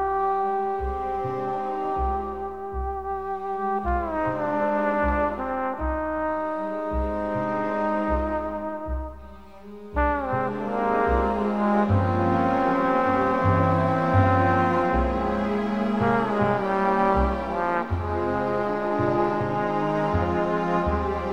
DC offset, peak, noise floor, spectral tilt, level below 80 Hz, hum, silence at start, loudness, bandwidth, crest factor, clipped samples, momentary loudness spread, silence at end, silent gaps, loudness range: 0.4%; -6 dBFS; -44 dBFS; -8.5 dB/octave; -36 dBFS; none; 0 s; -24 LUFS; 8.4 kHz; 18 dB; under 0.1%; 9 LU; 0 s; none; 6 LU